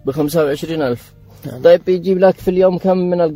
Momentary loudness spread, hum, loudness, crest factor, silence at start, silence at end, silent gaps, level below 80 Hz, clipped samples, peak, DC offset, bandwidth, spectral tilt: 10 LU; none; -15 LUFS; 14 dB; 0.05 s; 0 s; none; -46 dBFS; under 0.1%; 0 dBFS; under 0.1%; 16 kHz; -7 dB/octave